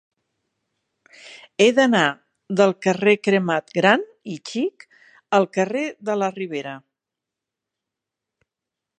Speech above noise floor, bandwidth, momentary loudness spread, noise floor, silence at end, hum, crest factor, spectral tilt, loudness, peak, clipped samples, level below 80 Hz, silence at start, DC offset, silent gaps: 66 dB; 9.8 kHz; 16 LU; -86 dBFS; 2.2 s; none; 22 dB; -5 dB/octave; -20 LUFS; 0 dBFS; under 0.1%; -76 dBFS; 1.25 s; under 0.1%; none